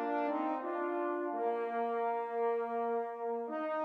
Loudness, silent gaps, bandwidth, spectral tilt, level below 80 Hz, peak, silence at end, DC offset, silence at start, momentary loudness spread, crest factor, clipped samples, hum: -36 LUFS; none; 5.2 kHz; -6.5 dB/octave; under -90 dBFS; -24 dBFS; 0 s; under 0.1%; 0 s; 3 LU; 12 dB; under 0.1%; none